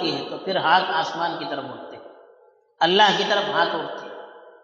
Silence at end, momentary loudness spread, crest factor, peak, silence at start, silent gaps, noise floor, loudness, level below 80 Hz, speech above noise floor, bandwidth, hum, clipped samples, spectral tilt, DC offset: 0.15 s; 20 LU; 20 dB; -4 dBFS; 0 s; none; -56 dBFS; -21 LUFS; -78 dBFS; 35 dB; 7.6 kHz; none; under 0.1%; -0.5 dB/octave; under 0.1%